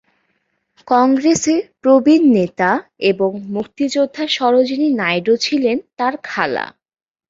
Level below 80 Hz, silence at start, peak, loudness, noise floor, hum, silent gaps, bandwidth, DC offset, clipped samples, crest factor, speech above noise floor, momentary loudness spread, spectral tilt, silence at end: -58 dBFS; 0.85 s; -2 dBFS; -16 LUFS; -67 dBFS; none; none; 7.8 kHz; under 0.1%; under 0.1%; 14 dB; 52 dB; 9 LU; -4.5 dB/octave; 0.65 s